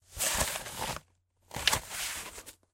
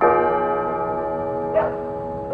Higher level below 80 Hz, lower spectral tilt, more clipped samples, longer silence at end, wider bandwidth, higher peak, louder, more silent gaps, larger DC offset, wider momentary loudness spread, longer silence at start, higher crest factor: about the same, -50 dBFS vs -48 dBFS; second, -1 dB/octave vs -9 dB/octave; neither; first, 0.2 s vs 0 s; first, 16 kHz vs 5 kHz; about the same, -6 dBFS vs -4 dBFS; second, -32 LUFS vs -22 LUFS; neither; neither; first, 15 LU vs 9 LU; about the same, 0.1 s vs 0 s; first, 30 dB vs 18 dB